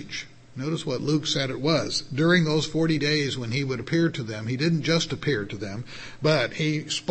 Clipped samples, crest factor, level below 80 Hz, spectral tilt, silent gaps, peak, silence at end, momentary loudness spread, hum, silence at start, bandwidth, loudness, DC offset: under 0.1%; 18 dB; -54 dBFS; -5 dB/octave; none; -8 dBFS; 0 s; 12 LU; none; 0 s; 8.8 kHz; -25 LUFS; under 0.1%